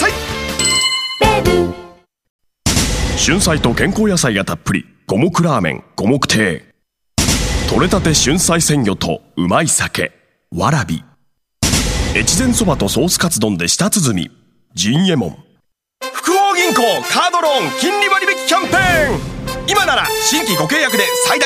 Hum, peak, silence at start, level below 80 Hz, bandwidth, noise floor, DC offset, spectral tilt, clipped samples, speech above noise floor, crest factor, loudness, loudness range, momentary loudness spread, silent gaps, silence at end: none; 0 dBFS; 0 s; -30 dBFS; 15.5 kHz; -61 dBFS; under 0.1%; -3.5 dB/octave; under 0.1%; 46 dB; 16 dB; -14 LUFS; 3 LU; 9 LU; 2.30-2.39 s; 0 s